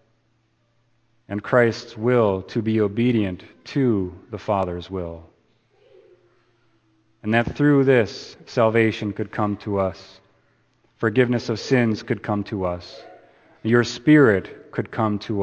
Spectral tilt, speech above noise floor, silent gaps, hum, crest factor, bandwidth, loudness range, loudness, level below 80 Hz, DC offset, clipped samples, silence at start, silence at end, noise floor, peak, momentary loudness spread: -7 dB/octave; 45 dB; none; none; 20 dB; 8.4 kHz; 6 LU; -21 LUFS; -54 dBFS; under 0.1%; under 0.1%; 1.3 s; 0 s; -65 dBFS; -2 dBFS; 14 LU